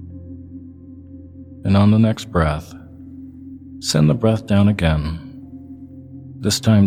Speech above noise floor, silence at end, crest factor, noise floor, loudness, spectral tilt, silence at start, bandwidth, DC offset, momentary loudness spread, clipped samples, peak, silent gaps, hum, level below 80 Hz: 23 dB; 0 s; 18 dB; -38 dBFS; -18 LUFS; -6 dB/octave; 0 s; 15.5 kHz; under 0.1%; 23 LU; under 0.1%; -2 dBFS; none; none; -36 dBFS